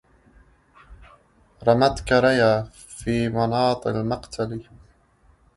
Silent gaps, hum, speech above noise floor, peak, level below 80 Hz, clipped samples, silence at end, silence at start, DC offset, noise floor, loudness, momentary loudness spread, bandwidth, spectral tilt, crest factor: none; none; 37 dB; -4 dBFS; -46 dBFS; under 0.1%; 0.95 s; 0.9 s; under 0.1%; -58 dBFS; -22 LUFS; 12 LU; 11.5 kHz; -6 dB/octave; 20 dB